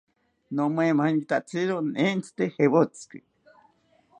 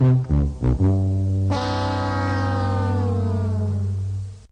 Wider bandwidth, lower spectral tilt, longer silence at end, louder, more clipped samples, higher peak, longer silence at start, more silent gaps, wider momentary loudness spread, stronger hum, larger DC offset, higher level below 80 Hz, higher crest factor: first, 10.5 kHz vs 8.6 kHz; second, -6.5 dB/octave vs -8 dB/octave; first, 1.05 s vs 0.1 s; second, -25 LUFS vs -22 LUFS; neither; about the same, -6 dBFS vs -8 dBFS; first, 0.5 s vs 0 s; neither; first, 9 LU vs 5 LU; neither; neither; second, -76 dBFS vs -32 dBFS; first, 20 dB vs 14 dB